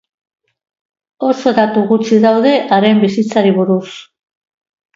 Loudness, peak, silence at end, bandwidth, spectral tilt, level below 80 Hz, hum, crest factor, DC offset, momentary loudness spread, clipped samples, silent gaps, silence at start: -12 LUFS; 0 dBFS; 0.95 s; 7.6 kHz; -6.5 dB/octave; -62 dBFS; none; 14 dB; under 0.1%; 8 LU; under 0.1%; none; 1.2 s